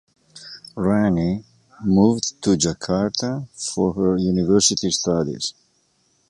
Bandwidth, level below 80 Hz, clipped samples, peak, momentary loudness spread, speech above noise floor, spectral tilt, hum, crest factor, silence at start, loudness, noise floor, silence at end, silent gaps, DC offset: 11.5 kHz; -46 dBFS; under 0.1%; -2 dBFS; 12 LU; 44 dB; -4.5 dB/octave; none; 20 dB; 0.35 s; -20 LUFS; -64 dBFS; 0.8 s; none; under 0.1%